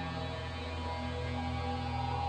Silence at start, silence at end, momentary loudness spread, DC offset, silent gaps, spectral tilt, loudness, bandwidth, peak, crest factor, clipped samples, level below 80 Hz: 0 s; 0 s; 3 LU; under 0.1%; none; -6.5 dB/octave; -37 LUFS; 9.4 kHz; -24 dBFS; 12 dB; under 0.1%; -46 dBFS